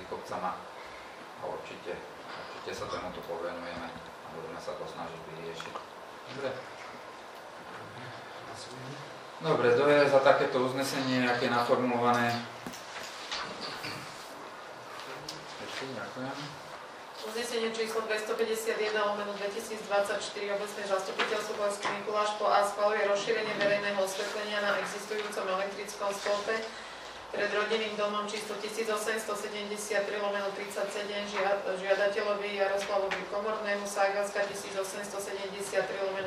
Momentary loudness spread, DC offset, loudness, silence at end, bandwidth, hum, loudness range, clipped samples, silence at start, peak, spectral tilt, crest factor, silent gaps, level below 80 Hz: 16 LU; under 0.1%; -32 LUFS; 0 s; 15.5 kHz; none; 13 LU; under 0.1%; 0 s; -8 dBFS; -3.5 dB/octave; 24 dB; none; -70 dBFS